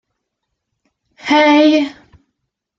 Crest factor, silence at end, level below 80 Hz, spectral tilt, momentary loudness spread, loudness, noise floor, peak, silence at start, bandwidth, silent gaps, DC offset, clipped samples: 16 dB; 0.85 s; -60 dBFS; -3.5 dB/octave; 15 LU; -12 LUFS; -75 dBFS; -2 dBFS; 1.25 s; 7.4 kHz; none; under 0.1%; under 0.1%